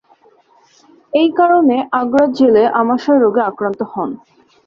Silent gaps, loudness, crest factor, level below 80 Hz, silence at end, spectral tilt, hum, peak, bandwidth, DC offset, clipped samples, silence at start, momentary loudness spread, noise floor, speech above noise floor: none; -14 LUFS; 14 dB; -60 dBFS; 0.5 s; -7 dB/octave; none; -2 dBFS; 7 kHz; under 0.1%; under 0.1%; 1.15 s; 10 LU; -51 dBFS; 38 dB